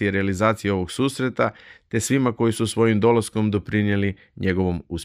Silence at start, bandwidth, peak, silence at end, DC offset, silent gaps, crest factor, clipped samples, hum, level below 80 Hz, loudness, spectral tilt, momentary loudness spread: 0 s; 15.5 kHz; -4 dBFS; 0 s; under 0.1%; none; 16 dB; under 0.1%; none; -50 dBFS; -22 LUFS; -6 dB/octave; 6 LU